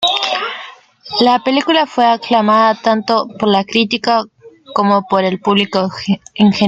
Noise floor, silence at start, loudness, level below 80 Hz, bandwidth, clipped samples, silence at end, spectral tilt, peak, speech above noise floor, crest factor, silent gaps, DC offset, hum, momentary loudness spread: -36 dBFS; 0 s; -14 LUFS; -56 dBFS; 8 kHz; under 0.1%; 0 s; -5.5 dB/octave; 0 dBFS; 22 dB; 14 dB; none; under 0.1%; none; 8 LU